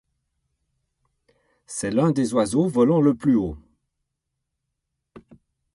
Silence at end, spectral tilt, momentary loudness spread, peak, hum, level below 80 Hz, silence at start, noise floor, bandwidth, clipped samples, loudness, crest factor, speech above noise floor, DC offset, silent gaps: 0.55 s; -7 dB/octave; 13 LU; -6 dBFS; none; -52 dBFS; 1.7 s; -80 dBFS; 11.5 kHz; under 0.1%; -21 LUFS; 18 dB; 60 dB; under 0.1%; none